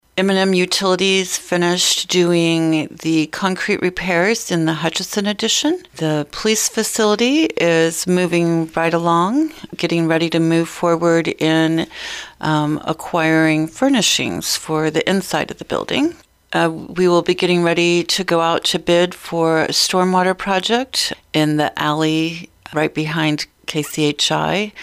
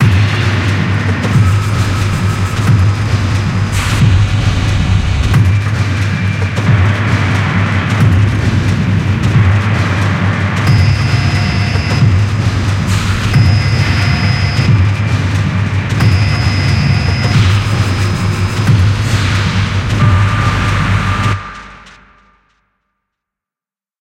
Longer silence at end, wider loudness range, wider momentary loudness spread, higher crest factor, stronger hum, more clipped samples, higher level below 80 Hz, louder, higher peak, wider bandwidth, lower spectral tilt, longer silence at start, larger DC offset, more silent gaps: second, 0 s vs 2.1 s; about the same, 3 LU vs 2 LU; about the same, 6 LU vs 4 LU; about the same, 12 dB vs 12 dB; neither; neither; second, -52 dBFS vs -24 dBFS; second, -17 LUFS vs -12 LUFS; second, -4 dBFS vs 0 dBFS; first, 16 kHz vs 11.5 kHz; second, -4 dB/octave vs -6 dB/octave; first, 0.15 s vs 0 s; neither; neither